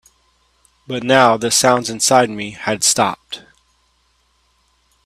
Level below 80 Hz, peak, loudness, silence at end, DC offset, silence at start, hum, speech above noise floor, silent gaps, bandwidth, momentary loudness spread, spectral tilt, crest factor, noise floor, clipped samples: -58 dBFS; 0 dBFS; -15 LUFS; 1.65 s; under 0.1%; 0.9 s; none; 45 dB; none; 15.5 kHz; 16 LU; -2.5 dB/octave; 18 dB; -61 dBFS; under 0.1%